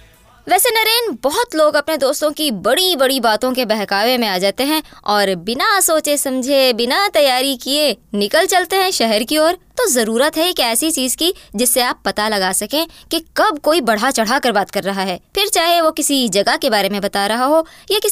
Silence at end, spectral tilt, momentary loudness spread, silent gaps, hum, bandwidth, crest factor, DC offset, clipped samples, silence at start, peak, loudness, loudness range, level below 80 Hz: 0 s; -2 dB/octave; 5 LU; none; none; 16 kHz; 12 dB; under 0.1%; under 0.1%; 0.45 s; -4 dBFS; -15 LUFS; 2 LU; -50 dBFS